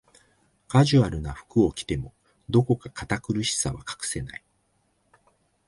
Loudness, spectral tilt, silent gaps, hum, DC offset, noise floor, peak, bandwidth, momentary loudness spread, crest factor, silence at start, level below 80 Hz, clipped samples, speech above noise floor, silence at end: -25 LUFS; -5.5 dB/octave; none; none; under 0.1%; -69 dBFS; -6 dBFS; 11.5 kHz; 13 LU; 22 dB; 0.7 s; -46 dBFS; under 0.1%; 45 dB; 1.3 s